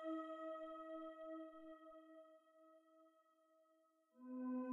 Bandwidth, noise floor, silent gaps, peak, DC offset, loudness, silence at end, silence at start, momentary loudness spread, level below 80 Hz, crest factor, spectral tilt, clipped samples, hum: 7.4 kHz; -79 dBFS; none; -38 dBFS; under 0.1%; -52 LUFS; 0 s; 0 s; 21 LU; under -90 dBFS; 14 dB; -6 dB/octave; under 0.1%; none